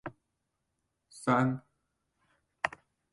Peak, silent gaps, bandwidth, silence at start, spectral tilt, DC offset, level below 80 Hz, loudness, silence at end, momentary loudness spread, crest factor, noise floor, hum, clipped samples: -12 dBFS; none; 11.5 kHz; 0.05 s; -6.5 dB/octave; under 0.1%; -70 dBFS; -32 LUFS; 0.45 s; 13 LU; 26 dB; -83 dBFS; none; under 0.1%